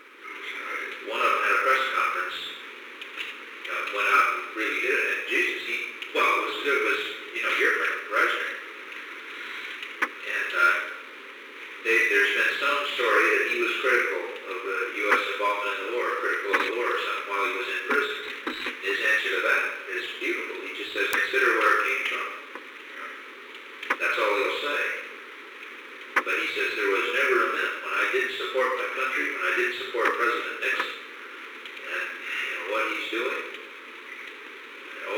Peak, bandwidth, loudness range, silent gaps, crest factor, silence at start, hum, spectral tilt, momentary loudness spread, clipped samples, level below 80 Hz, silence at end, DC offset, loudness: -2 dBFS; 19 kHz; 5 LU; none; 26 dB; 0 s; none; -0.5 dB/octave; 17 LU; under 0.1%; -76 dBFS; 0 s; under 0.1%; -25 LUFS